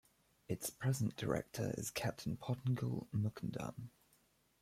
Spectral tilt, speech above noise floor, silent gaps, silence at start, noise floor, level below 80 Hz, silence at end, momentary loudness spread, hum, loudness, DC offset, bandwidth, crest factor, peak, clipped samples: -5.5 dB/octave; 34 dB; none; 0.5 s; -74 dBFS; -66 dBFS; 0.75 s; 8 LU; none; -41 LUFS; under 0.1%; 15.5 kHz; 18 dB; -24 dBFS; under 0.1%